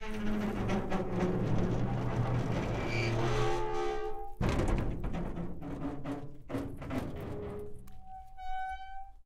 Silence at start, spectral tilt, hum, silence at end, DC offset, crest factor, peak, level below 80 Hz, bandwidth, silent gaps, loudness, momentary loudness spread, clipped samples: 0 s; -7 dB/octave; none; 0.05 s; under 0.1%; 16 dB; -18 dBFS; -42 dBFS; 12.5 kHz; none; -35 LUFS; 12 LU; under 0.1%